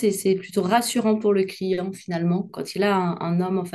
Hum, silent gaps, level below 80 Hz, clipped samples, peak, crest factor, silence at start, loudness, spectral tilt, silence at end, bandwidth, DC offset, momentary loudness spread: none; none; -66 dBFS; under 0.1%; -6 dBFS; 16 dB; 0 s; -23 LUFS; -5.5 dB/octave; 0.05 s; 12.5 kHz; under 0.1%; 6 LU